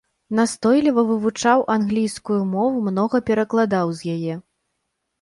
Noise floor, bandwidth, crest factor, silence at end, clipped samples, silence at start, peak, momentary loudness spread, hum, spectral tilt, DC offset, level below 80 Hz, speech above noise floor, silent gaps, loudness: -76 dBFS; 11.5 kHz; 16 dB; 0.8 s; under 0.1%; 0.3 s; -4 dBFS; 8 LU; none; -6 dB/octave; under 0.1%; -58 dBFS; 56 dB; none; -20 LUFS